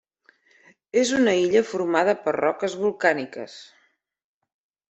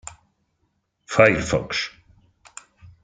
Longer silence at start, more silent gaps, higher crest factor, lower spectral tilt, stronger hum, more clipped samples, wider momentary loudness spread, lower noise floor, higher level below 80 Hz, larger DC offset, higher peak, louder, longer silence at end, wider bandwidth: second, 0.95 s vs 1.1 s; neither; about the same, 20 dB vs 24 dB; about the same, -4 dB/octave vs -4.5 dB/octave; neither; neither; second, 15 LU vs 27 LU; second, -61 dBFS vs -71 dBFS; second, -68 dBFS vs -48 dBFS; neither; about the same, -4 dBFS vs -2 dBFS; about the same, -22 LUFS vs -20 LUFS; about the same, 1.25 s vs 1.15 s; second, 8.4 kHz vs 9.4 kHz